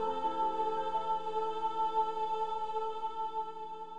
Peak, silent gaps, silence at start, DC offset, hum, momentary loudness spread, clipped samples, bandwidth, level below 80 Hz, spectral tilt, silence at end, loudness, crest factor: -20 dBFS; none; 0 s; 0.8%; none; 5 LU; under 0.1%; 9.6 kHz; -78 dBFS; -5 dB/octave; 0 s; -35 LUFS; 14 dB